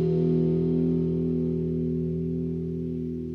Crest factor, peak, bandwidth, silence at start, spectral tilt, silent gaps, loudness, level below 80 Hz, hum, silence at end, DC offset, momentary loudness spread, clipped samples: 12 dB; -14 dBFS; 4.3 kHz; 0 s; -12 dB/octave; none; -27 LUFS; -46 dBFS; none; 0 s; under 0.1%; 7 LU; under 0.1%